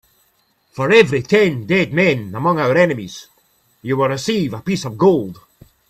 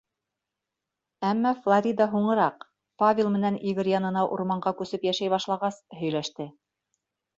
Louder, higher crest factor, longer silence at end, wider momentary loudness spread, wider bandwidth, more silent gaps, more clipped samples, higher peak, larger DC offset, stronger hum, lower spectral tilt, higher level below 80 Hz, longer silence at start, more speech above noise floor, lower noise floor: first, -16 LUFS vs -26 LUFS; about the same, 18 dB vs 18 dB; second, 0.55 s vs 0.85 s; first, 16 LU vs 8 LU; first, 14 kHz vs 7.8 kHz; neither; neither; first, 0 dBFS vs -10 dBFS; neither; neither; about the same, -6 dB/octave vs -6 dB/octave; first, -54 dBFS vs -70 dBFS; second, 0.75 s vs 1.2 s; second, 45 dB vs 61 dB; second, -61 dBFS vs -86 dBFS